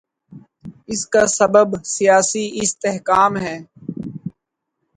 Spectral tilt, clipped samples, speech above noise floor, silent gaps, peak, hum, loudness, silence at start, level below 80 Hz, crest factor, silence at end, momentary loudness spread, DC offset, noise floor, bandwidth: -3.5 dB/octave; under 0.1%; 60 dB; none; 0 dBFS; none; -17 LUFS; 0.3 s; -56 dBFS; 18 dB; 0.65 s; 17 LU; under 0.1%; -77 dBFS; 10.5 kHz